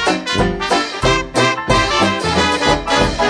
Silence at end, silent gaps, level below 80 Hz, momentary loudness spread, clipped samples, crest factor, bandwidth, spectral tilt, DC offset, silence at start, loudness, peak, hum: 0 s; none; -30 dBFS; 3 LU; under 0.1%; 16 dB; 11 kHz; -4 dB/octave; under 0.1%; 0 s; -15 LUFS; 0 dBFS; none